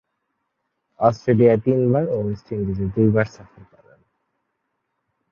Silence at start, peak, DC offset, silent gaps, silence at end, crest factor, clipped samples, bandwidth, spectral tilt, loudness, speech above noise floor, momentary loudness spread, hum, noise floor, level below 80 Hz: 1 s; -2 dBFS; under 0.1%; none; 1.7 s; 20 dB; under 0.1%; 7 kHz; -9.5 dB/octave; -20 LUFS; 56 dB; 11 LU; none; -75 dBFS; -48 dBFS